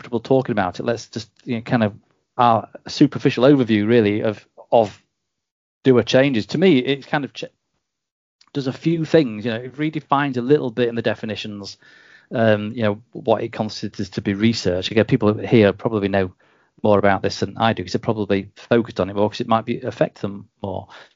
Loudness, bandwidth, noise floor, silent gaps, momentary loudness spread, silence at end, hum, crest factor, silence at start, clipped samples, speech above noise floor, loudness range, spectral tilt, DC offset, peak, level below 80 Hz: -20 LUFS; 7.6 kHz; -76 dBFS; 5.51-5.81 s, 8.12-8.39 s; 13 LU; 0.1 s; none; 18 dB; 0.05 s; under 0.1%; 57 dB; 5 LU; -6.5 dB/octave; under 0.1%; -2 dBFS; -62 dBFS